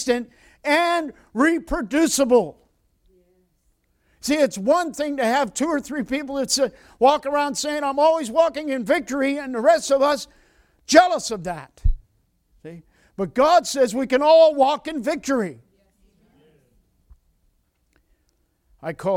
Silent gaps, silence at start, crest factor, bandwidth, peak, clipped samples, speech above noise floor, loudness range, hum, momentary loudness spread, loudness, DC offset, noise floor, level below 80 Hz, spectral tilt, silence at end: none; 0 s; 22 dB; 17 kHz; 0 dBFS; under 0.1%; 47 dB; 5 LU; none; 15 LU; -20 LUFS; under 0.1%; -67 dBFS; -38 dBFS; -3.5 dB/octave; 0 s